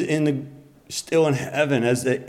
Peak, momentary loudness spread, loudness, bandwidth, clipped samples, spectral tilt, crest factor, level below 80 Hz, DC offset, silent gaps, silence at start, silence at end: -8 dBFS; 11 LU; -22 LUFS; 16 kHz; under 0.1%; -5.5 dB/octave; 14 dB; -62 dBFS; under 0.1%; none; 0 s; 0 s